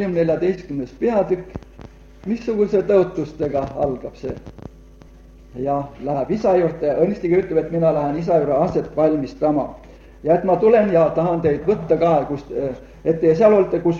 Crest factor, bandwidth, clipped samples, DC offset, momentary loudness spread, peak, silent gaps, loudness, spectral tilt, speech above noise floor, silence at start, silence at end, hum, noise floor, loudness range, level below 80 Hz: 16 dB; 7.2 kHz; under 0.1%; under 0.1%; 14 LU; -2 dBFS; none; -19 LUFS; -9 dB/octave; 25 dB; 0 s; 0 s; none; -44 dBFS; 6 LU; -44 dBFS